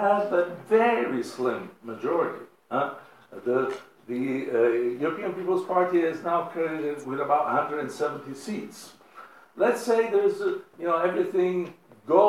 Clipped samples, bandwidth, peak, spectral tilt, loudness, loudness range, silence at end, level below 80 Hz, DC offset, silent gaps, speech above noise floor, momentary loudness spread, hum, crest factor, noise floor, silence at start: under 0.1%; 14 kHz; -6 dBFS; -6 dB/octave; -26 LUFS; 3 LU; 0 s; -84 dBFS; under 0.1%; none; 23 dB; 13 LU; none; 20 dB; -49 dBFS; 0 s